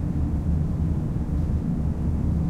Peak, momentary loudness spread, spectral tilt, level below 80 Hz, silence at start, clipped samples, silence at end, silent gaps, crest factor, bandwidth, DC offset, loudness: -14 dBFS; 2 LU; -10 dB/octave; -30 dBFS; 0 s; under 0.1%; 0 s; none; 10 dB; 6.6 kHz; under 0.1%; -26 LUFS